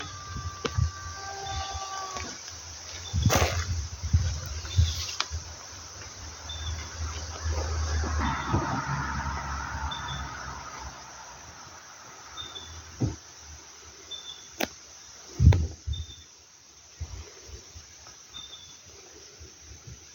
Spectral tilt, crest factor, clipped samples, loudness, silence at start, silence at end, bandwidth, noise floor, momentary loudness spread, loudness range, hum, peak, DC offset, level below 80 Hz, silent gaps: -4 dB/octave; 26 dB; under 0.1%; -31 LUFS; 0 s; 0 s; 17 kHz; -53 dBFS; 19 LU; 10 LU; none; -4 dBFS; under 0.1%; -38 dBFS; none